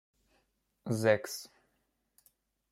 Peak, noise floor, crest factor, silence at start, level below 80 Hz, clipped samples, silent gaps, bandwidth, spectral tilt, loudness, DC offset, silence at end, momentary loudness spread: -12 dBFS; -79 dBFS; 24 dB; 0.85 s; -76 dBFS; under 0.1%; none; 16 kHz; -5 dB/octave; -32 LUFS; under 0.1%; 1.25 s; 20 LU